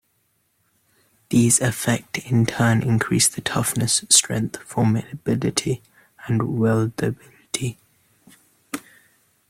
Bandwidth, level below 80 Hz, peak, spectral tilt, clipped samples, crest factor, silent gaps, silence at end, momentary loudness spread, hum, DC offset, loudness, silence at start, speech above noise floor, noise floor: 16 kHz; -54 dBFS; 0 dBFS; -4 dB/octave; under 0.1%; 22 dB; none; 0.7 s; 15 LU; none; under 0.1%; -20 LUFS; 1.3 s; 47 dB; -68 dBFS